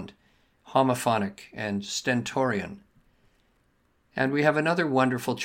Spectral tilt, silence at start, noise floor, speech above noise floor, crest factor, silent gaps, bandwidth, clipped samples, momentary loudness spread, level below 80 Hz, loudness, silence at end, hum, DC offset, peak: -5 dB/octave; 0 s; -68 dBFS; 42 dB; 20 dB; none; 16.5 kHz; under 0.1%; 12 LU; -66 dBFS; -26 LUFS; 0 s; none; under 0.1%; -8 dBFS